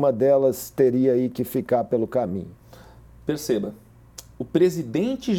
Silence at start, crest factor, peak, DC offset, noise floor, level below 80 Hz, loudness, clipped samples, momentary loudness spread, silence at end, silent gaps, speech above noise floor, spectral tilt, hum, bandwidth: 0 s; 16 dB; -6 dBFS; under 0.1%; -47 dBFS; -54 dBFS; -23 LUFS; under 0.1%; 17 LU; 0 s; none; 25 dB; -6.5 dB/octave; none; 18.5 kHz